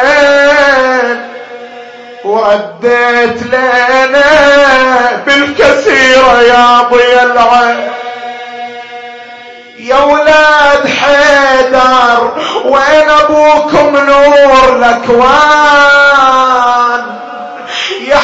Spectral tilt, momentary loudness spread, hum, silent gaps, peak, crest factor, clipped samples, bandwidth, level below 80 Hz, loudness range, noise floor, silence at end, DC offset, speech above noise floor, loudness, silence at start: -3 dB/octave; 17 LU; none; none; 0 dBFS; 6 dB; 0.5%; 8 kHz; -38 dBFS; 5 LU; -29 dBFS; 0 s; under 0.1%; 24 dB; -6 LUFS; 0 s